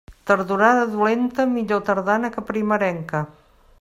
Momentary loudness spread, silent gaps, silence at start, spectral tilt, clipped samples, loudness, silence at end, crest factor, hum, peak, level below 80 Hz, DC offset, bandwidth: 9 LU; none; 0.1 s; -6.5 dB/octave; under 0.1%; -20 LUFS; 0.5 s; 20 dB; none; -2 dBFS; -54 dBFS; under 0.1%; 14 kHz